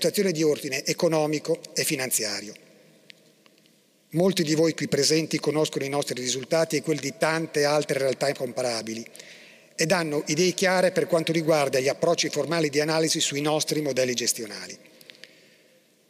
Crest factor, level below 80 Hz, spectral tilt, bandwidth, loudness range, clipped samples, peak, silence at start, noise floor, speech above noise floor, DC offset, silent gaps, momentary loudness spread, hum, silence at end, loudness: 22 dB; -74 dBFS; -3.5 dB/octave; 16 kHz; 4 LU; under 0.1%; -4 dBFS; 0 s; -61 dBFS; 36 dB; under 0.1%; none; 8 LU; none; 1.35 s; -24 LUFS